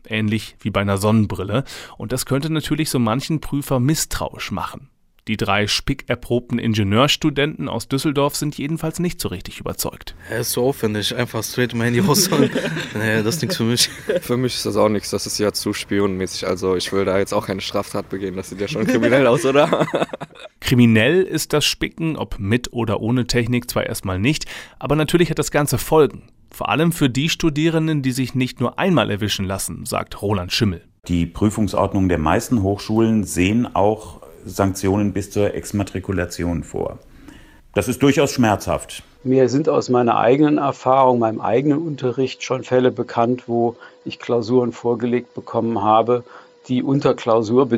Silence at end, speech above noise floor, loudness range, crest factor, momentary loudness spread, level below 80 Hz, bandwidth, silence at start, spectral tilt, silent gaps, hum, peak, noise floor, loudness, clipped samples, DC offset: 0 s; 24 dB; 5 LU; 16 dB; 10 LU; -42 dBFS; 16 kHz; 0.1 s; -5 dB/octave; none; none; -2 dBFS; -43 dBFS; -19 LUFS; under 0.1%; under 0.1%